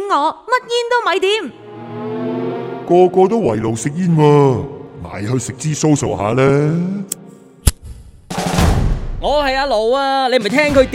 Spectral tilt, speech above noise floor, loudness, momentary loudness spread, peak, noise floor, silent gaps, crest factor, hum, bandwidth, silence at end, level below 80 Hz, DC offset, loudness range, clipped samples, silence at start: -5.5 dB/octave; 25 dB; -16 LUFS; 14 LU; 0 dBFS; -39 dBFS; none; 16 dB; none; 16.5 kHz; 0 s; -28 dBFS; under 0.1%; 3 LU; under 0.1%; 0 s